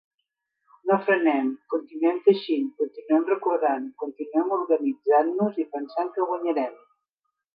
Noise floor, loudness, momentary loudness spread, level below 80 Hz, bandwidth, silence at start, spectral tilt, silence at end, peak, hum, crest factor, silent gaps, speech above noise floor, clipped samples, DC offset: -81 dBFS; -25 LUFS; 10 LU; -84 dBFS; 5.2 kHz; 0.85 s; -9.5 dB/octave; 0.8 s; -6 dBFS; none; 18 dB; none; 58 dB; under 0.1%; under 0.1%